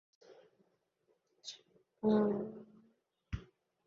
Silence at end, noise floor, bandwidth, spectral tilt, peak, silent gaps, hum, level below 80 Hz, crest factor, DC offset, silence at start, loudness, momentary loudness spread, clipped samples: 0.45 s; -79 dBFS; 7 kHz; -6.5 dB/octave; -20 dBFS; none; none; -60 dBFS; 20 dB; under 0.1%; 0.3 s; -36 LUFS; 21 LU; under 0.1%